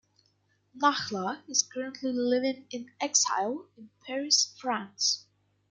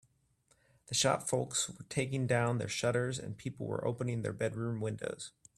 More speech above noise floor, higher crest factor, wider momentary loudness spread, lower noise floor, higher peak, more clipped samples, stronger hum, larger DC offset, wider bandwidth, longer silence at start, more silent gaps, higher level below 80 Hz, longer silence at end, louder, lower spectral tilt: about the same, 41 dB vs 38 dB; about the same, 22 dB vs 20 dB; about the same, 12 LU vs 10 LU; about the same, -71 dBFS vs -72 dBFS; first, -8 dBFS vs -14 dBFS; neither; first, 50 Hz at -70 dBFS vs none; neither; second, 11 kHz vs 13.5 kHz; second, 0.75 s vs 0.9 s; neither; second, -78 dBFS vs -68 dBFS; first, 0.5 s vs 0.3 s; first, -28 LUFS vs -35 LUFS; second, -1 dB/octave vs -4 dB/octave